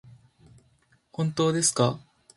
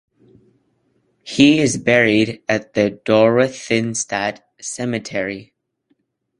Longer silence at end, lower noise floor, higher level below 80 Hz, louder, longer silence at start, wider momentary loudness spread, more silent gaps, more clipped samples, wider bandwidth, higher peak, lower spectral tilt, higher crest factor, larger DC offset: second, 0.4 s vs 0.95 s; about the same, -65 dBFS vs -66 dBFS; second, -64 dBFS vs -56 dBFS; second, -25 LUFS vs -17 LUFS; second, 0.05 s vs 1.25 s; first, 18 LU vs 13 LU; neither; neither; about the same, 11.5 kHz vs 11 kHz; second, -8 dBFS vs 0 dBFS; about the same, -4.5 dB/octave vs -4.5 dB/octave; about the same, 22 dB vs 18 dB; neither